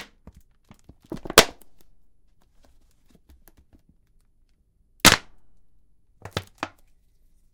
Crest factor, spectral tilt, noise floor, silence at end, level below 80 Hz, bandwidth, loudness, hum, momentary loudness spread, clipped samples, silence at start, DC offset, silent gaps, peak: 28 dB; -1.5 dB/octave; -63 dBFS; 0.9 s; -48 dBFS; 18 kHz; -19 LUFS; none; 23 LU; under 0.1%; 1.1 s; under 0.1%; none; 0 dBFS